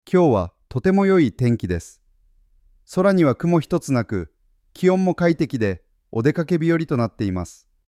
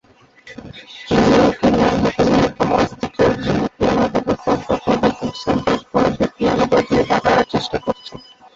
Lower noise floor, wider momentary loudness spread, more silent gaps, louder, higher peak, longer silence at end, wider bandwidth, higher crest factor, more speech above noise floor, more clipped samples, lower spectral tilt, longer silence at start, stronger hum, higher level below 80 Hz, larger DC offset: first, -58 dBFS vs -46 dBFS; about the same, 12 LU vs 10 LU; neither; second, -20 LUFS vs -17 LUFS; about the same, -4 dBFS vs -2 dBFS; about the same, 0.35 s vs 0.35 s; first, 13.5 kHz vs 7.8 kHz; about the same, 16 dB vs 16 dB; first, 39 dB vs 31 dB; neither; first, -7.5 dB/octave vs -6 dB/octave; second, 0.1 s vs 0.45 s; neither; second, -48 dBFS vs -38 dBFS; neither